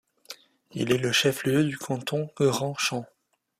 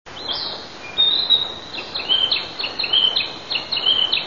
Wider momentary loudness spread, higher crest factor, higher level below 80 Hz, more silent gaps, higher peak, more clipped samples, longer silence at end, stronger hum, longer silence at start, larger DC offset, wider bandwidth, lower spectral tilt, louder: first, 21 LU vs 12 LU; about the same, 18 dB vs 18 dB; second, -66 dBFS vs -54 dBFS; neither; second, -10 dBFS vs -4 dBFS; neither; first, 0.55 s vs 0 s; neither; first, 0.3 s vs 0.05 s; second, under 0.1% vs 0.5%; first, 15.5 kHz vs 7.4 kHz; first, -4.5 dB/octave vs -2 dB/octave; second, -26 LUFS vs -18 LUFS